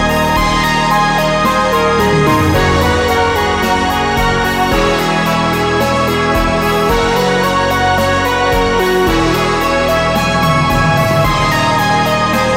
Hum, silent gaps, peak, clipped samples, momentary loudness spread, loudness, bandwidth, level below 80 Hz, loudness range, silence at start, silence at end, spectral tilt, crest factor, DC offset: none; none; -2 dBFS; under 0.1%; 2 LU; -12 LUFS; 16.5 kHz; -26 dBFS; 1 LU; 0 s; 0 s; -5 dB/octave; 10 dB; under 0.1%